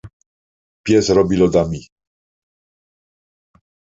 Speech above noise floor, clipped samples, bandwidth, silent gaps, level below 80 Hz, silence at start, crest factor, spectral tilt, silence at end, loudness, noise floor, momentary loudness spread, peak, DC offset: over 75 dB; under 0.1%; 8 kHz; 0.13-0.20 s, 0.26-0.84 s; -44 dBFS; 0.05 s; 18 dB; -6 dB/octave; 2.2 s; -16 LUFS; under -90 dBFS; 15 LU; -2 dBFS; under 0.1%